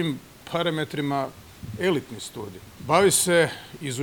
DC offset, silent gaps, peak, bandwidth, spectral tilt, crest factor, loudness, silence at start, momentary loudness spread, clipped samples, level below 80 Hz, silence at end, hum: under 0.1%; none; -6 dBFS; over 20 kHz; -3.5 dB/octave; 20 dB; -23 LUFS; 0 s; 20 LU; under 0.1%; -58 dBFS; 0 s; none